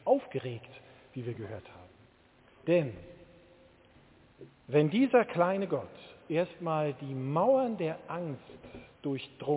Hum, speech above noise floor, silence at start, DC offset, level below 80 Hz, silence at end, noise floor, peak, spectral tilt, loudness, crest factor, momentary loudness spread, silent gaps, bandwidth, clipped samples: none; 31 dB; 0.05 s; under 0.1%; -68 dBFS; 0 s; -62 dBFS; -12 dBFS; -6.5 dB/octave; -31 LUFS; 20 dB; 21 LU; none; 4 kHz; under 0.1%